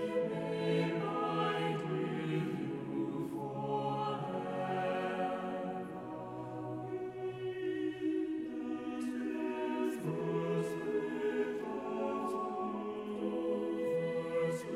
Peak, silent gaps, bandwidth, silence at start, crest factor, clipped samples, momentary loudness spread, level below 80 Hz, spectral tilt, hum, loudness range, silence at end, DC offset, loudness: -22 dBFS; none; 14 kHz; 0 s; 16 dB; under 0.1%; 6 LU; -74 dBFS; -7 dB/octave; none; 3 LU; 0 s; under 0.1%; -37 LUFS